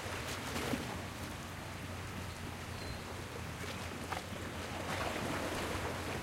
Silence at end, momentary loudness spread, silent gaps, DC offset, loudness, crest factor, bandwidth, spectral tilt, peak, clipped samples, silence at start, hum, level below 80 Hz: 0 s; 6 LU; none; under 0.1%; -41 LUFS; 18 dB; 16 kHz; -4 dB/octave; -22 dBFS; under 0.1%; 0 s; none; -54 dBFS